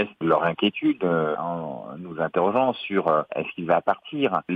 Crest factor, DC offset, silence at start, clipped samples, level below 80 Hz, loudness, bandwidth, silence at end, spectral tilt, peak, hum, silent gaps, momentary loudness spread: 18 dB; under 0.1%; 0 s; under 0.1%; -66 dBFS; -24 LUFS; 5 kHz; 0 s; -8.5 dB/octave; -6 dBFS; none; none; 8 LU